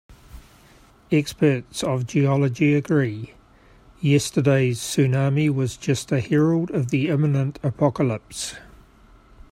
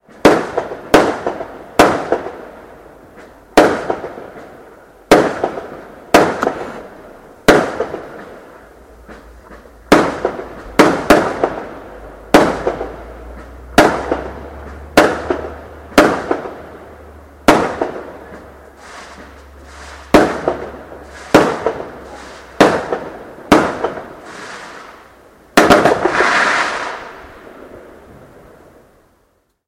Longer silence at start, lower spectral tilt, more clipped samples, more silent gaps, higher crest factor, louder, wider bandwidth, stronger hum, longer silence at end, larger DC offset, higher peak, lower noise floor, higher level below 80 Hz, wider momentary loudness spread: second, 0.1 s vs 0.25 s; first, -6.5 dB/octave vs -4.5 dB/octave; second, under 0.1% vs 0.2%; neither; about the same, 18 dB vs 16 dB; second, -22 LUFS vs -14 LUFS; about the same, 15 kHz vs 16.5 kHz; neither; second, 0.9 s vs 1.85 s; neither; second, -4 dBFS vs 0 dBFS; second, -52 dBFS vs -60 dBFS; second, -52 dBFS vs -38 dBFS; second, 8 LU vs 23 LU